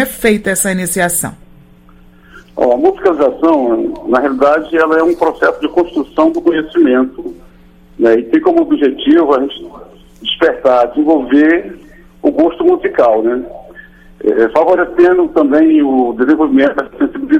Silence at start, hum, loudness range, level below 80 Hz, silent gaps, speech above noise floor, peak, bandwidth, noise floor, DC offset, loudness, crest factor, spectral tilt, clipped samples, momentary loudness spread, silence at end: 0 s; none; 3 LU; -42 dBFS; none; 30 dB; 0 dBFS; 16.5 kHz; -41 dBFS; under 0.1%; -12 LUFS; 12 dB; -4.5 dB/octave; under 0.1%; 8 LU; 0 s